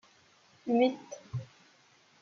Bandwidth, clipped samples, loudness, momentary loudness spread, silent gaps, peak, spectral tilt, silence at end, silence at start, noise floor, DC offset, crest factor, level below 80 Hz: 7.2 kHz; under 0.1%; -32 LUFS; 17 LU; none; -16 dBFS; -5.5 dB/octave; 0.75 s; 0.65 s; -64 dBFS; under 0.1%; 18 dB; -74 dBFS